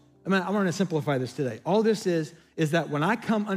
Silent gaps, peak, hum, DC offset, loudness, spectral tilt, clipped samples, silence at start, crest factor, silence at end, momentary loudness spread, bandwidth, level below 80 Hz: none; -12 dBFS; none; under 0.1%; -26 LUFS; -6 dB/octave; under 0.1%; 0.25 s; 16 dB; 0 s; 6 LU; 15.5 kHz; -72 dBFS